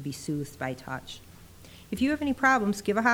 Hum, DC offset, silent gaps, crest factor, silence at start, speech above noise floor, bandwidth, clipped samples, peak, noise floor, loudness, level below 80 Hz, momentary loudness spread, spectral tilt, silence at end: none; under 0.1%; none; 20 dB; 0 s; 22 dB; over 20 kHz; under 0.1%; -8 dBFS; -50 dBFS; -28 LUFS; -56 dBFS; 15 LU; -5 dB/octave; 0 s